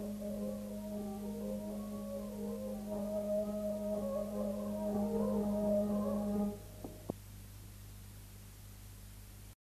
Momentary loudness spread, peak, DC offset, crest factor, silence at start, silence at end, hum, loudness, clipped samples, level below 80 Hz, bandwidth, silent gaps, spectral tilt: 18 LU; -20 dBFS; under 0.1%; 18 dB; 0 s; 0.2 s; 50 Hz at -55 dBFS; -39 LUFS; under 0.1%; -56 dBFS; 14 kHz; none; -7.5 dB/octave